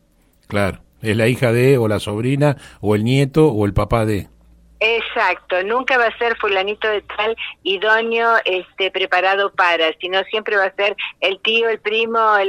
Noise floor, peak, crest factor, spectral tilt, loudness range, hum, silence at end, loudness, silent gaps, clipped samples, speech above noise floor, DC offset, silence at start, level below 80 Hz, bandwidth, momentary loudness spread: -55 dBFS; -2 dBFS; 16 dB; -6 dB/octave; 2 LU; none; 0 s; -17 LUFS; none; under 0.1%; 38 dB; under 0.1%; 0.5 s; -42 dBFS; 16 kHz; 6 LU